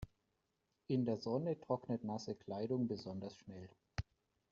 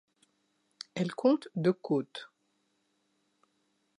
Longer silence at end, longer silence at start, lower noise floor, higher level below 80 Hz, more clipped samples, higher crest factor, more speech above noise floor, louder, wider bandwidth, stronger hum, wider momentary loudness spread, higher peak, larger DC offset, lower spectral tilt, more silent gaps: second, 0.5 s vs 1.75 s; second, 0 s vs 0.95 s; first, -85 dBFS vs -76 dBFS; first, -66 dBFS vs -84 dBFS; neither; about the same, 18 dB vs 20 dB; about the same, 44 dB vs 46 dB; second, -42 LUFS vs -31 LUFS; second, 7.4 kHz vs 11 kHz; neither; about the same, 16 LU vs 17 LU; second, -24 dBFS vs -14 dBFS; neither; about the same, -7.5 dB/octave vs -7 dB/octave; neither